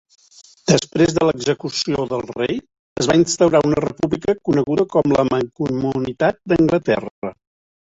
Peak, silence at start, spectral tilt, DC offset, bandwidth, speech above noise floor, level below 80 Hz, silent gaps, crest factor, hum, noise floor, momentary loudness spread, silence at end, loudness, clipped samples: -2 dBFS; 0.65 s; -5.5 dB/octave; under 0.1%; 8 kHz; 30 dB; -46 dBFS; 2.79-2.96 s, 7.11-7.22 s; 18 dB; none; -48 dBFS; 8 LU; 0.5 s; -18 LUFS; under 0.1%